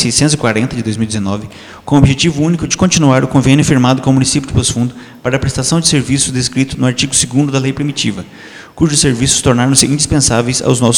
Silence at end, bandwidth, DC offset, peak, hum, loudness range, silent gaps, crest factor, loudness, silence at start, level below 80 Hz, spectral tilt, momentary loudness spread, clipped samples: 0 s; over 20 kHz; under 0.1%; 0 dBFS; none; 2 LU; none; 12 dB; -12 LUFS; 0 s; -32 dBFS; -4 dB/octave; 9 LU; 0.2%